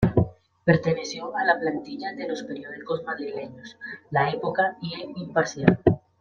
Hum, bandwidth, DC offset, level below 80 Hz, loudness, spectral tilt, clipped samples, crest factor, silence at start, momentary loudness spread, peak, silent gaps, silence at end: none; 7.2 kHz; under 0.1%; -50 dBFS; -26 LUFS; -6.5 dB/octave; under 0.1%; 24 dB; 0 s; 14 LU; -2 dBFS; none; 0.25 s